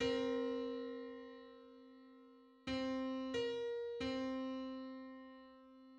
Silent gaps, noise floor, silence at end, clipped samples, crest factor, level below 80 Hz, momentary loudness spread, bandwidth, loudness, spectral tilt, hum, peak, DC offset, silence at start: none; -64 dBFS; 0 s; under 0.1%; 16 dB; -70 dBFS; 20 LU; 8.6 kHz; -43 LUFS; -5 dB/octave; none; -26 dBFS; under 0.1%; 0 s